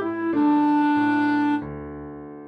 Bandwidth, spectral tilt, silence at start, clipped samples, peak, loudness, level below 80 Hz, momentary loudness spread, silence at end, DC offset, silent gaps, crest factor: 5 kHz; -7.5 dB/octave; 0 s; under 0.1%; -12 dBFS; -21 LUFS; -52 dBFS; 17 LU; 0 s; under 0.1%; none; 10 dB